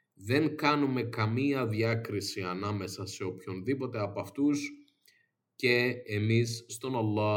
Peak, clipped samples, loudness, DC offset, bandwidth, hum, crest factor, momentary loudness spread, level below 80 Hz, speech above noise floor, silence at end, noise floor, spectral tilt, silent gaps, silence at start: -10 dBFS; under 0.1%; -31 LUFS; under 0.1%; 17 kHz; none; 22 dB; 10 LU; -74 dBFS; 41 dB; 0 s; -71 dBFS; -6 dB/octave; none; 0.2 s